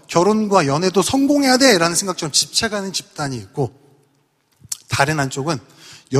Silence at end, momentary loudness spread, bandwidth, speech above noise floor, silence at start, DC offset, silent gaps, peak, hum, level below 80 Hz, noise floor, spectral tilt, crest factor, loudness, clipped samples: 0 s; 14 LU; 15.5 kHz; 45 dB; 0.1 s; under 0.1%; none; 0 dBFS; none; -52 dBFS; -62 dBFS; -3.5 dB/octave; 18 dB; -17 LUFS; under 0.1%